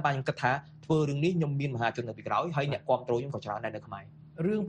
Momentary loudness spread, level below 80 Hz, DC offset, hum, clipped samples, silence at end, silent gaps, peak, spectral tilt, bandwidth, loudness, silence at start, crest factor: 9 LU; -64 dBFS; under 0.1%; none; under 0.1%; 0 s; none; -12 dBFS; -7 dB/octave; 8.8 kHz; -31 LUFS; 0 s; 18 dB